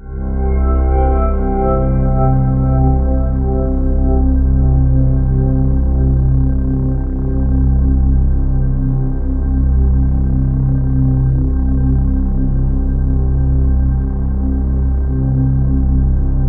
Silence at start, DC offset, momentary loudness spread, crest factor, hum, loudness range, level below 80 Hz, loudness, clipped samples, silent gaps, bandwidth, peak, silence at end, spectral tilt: 0 s; under 0.1%; 4 LU; 10 dB; none; 2 LU; -14 dBFS; -15 LUFS; under 0.1%; none; 2.3 kHz; -2 dBFS; 0 s; -14 dB/octave